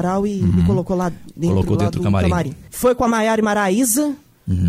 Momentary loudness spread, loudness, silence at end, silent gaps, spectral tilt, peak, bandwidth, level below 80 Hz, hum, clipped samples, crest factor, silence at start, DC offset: 8 LU; -18 LUFS; 0 s; none; -6 dB/octave; -6 dBFS; 16 kHz; -36 dBFS; none; under 0.1%; 12 dB; 0 s; under 0.1%